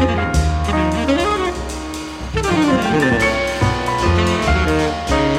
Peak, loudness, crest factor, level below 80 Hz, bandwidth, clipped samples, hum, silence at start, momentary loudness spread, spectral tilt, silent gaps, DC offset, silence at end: -2 dBFS; -17 LUFS; 14 dB; -26 dBFS; 15 kHz; under 0.1%; none; 0 s; 9 LU; -5.5 dB/octave; none; under 0.1%; 0 s